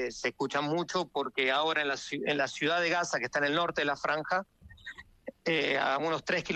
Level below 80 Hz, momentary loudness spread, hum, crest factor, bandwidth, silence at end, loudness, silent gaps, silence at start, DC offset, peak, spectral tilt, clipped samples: -66 dBFS; 17 LU; none; 16 dB; 12.5 kHz; 0 s; -30 LUFS; none; 0 s; under 0.1%; -14 dBFS; -3.5 dB/octave; under 0.1%